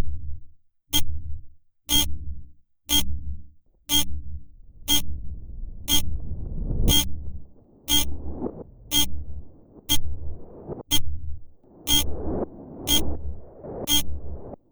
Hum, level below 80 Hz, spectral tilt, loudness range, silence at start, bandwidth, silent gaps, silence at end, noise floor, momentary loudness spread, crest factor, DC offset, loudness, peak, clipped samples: none; -34 dBFS; -2.5 dB/octave; 2 LU; 0 s; over 20 kHz; none; 0.15 s; -44 dBFS; 21 LU; 18 dB; under 0.1%; -24 LUFS; -6 dBFS; under 0.1%